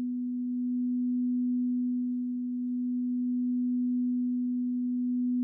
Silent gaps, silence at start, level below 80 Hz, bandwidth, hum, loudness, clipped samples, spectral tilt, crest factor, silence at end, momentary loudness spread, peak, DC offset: none; 0 s; under -90 dBFS; 0.4 kHz; none; -30 LUFS; under 0.1%; -14.5 dB/octave; 4 dB; 0 s; 4 LU; -24 dBFS; under 0.1%